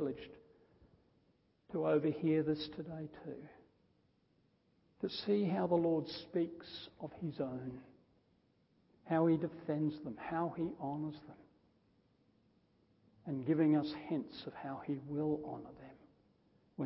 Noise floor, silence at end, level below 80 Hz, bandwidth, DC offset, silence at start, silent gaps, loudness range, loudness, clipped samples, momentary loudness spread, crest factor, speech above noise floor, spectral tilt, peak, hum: -75 dBFS; 0 s; -74 dBFS; 5.6 kHz; under 0.1%; 0 s; none; 4 LU; -38 LUFS; under 0.1%; 17 LU; 20 dB; 37 dB; -6.5 dB/octave; -20 dBFS; none